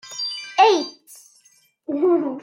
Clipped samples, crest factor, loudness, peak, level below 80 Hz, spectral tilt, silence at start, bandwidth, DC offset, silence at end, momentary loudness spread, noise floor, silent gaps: under 0.1%; 18 dB; -19 LUFS; -4 dBFS; -82 dBFS; -2.5 dB/octave; 0.05 s; 16 kHz; under 0.1%; 0 s; 15 LU; -58 dBFS; none